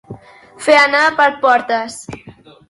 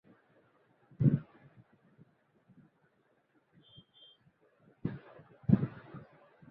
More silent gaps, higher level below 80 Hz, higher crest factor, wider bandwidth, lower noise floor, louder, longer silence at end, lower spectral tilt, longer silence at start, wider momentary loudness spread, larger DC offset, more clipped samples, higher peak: neither; first, -56 dBFS vs -62 dBFS; second, 16 dB vs 26 dB; first, 11.5 kHz vs 4 kHz; second, -36 dBFS vs -73 dBFS; first, -13 LUFS vs -33 LUFS; about the same, 0.4 s vs 0.5 s; second, -3 dB/octave vs -9.5 dB/octave; second, 0.1 s vs 1 s; second, 21 LU vs 26 LU; neither; neither; first, 0 dBFS vs -12 dBFS